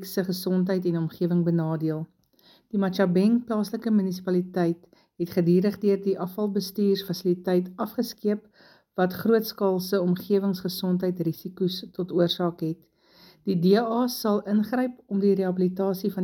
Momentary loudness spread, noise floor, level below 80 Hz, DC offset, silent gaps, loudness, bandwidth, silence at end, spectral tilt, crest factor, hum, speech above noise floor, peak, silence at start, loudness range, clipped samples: 8 LU; -59 dBFS; -70 dBFS; under 0.1%; none; -26 LUFS; 17 kHz; 0 s; -7 dB/octave; 18 dB; none; 35 dB; -8 dBFS; 0 s; 2 LU; under 0.1%